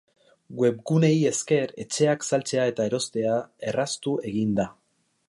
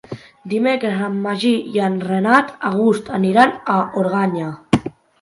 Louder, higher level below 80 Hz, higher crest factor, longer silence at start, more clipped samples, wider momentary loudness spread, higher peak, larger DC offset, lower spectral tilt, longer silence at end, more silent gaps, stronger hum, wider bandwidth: second, -25 LUFS vs -18 LUFS; second, -64 dBFS vs -52 dBFS; about the same, 16 dB vs 18 dB; first, 0.5 s vs 0.1 s; neither; about the same, 7 LU vs 8 LU; second, -8 dBFS vs 0 dBFS; neither; second, -5 dB/octave vs -6.5 dB/octave; first, 0.55 s vs 0.3 s; neither; neither; about the same, 11.5 kHz vs 11.5 kHz